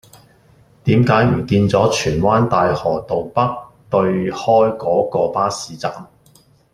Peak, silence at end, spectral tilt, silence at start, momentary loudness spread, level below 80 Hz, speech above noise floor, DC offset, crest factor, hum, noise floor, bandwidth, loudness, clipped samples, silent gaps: -2 dBFS; 0.7 s; -6.5 dB/octave; 0.85 s; 10 LU; -44 dBFS; 36 dB; under 0.1%; 16 dB; none; -52 dBFS; 13.5 kHz; -17 LUFS; under 0.1%; none